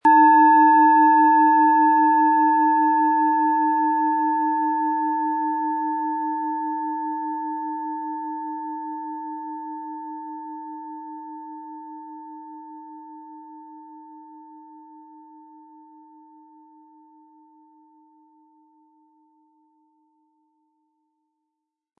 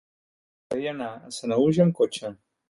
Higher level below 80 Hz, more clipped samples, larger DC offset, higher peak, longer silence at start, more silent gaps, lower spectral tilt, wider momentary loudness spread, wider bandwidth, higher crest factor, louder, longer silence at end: second, -86 dBFS vs -64 dBFS; neither; neither; about the same, -6 dBFS vs -8 dBFS; second, 0.05 s vs 0.7 s; neither; about the same, -6.5 dB/octave vs -6.5 dB/octave; first, 25 LU vs 14 LU; second, 3.9 kHz vs 11.5 kHz; about the same, 16 dB vs 18 dB; first, -19 LUFS vs -25 LUFS; first, 7.4 s vs 0.35 s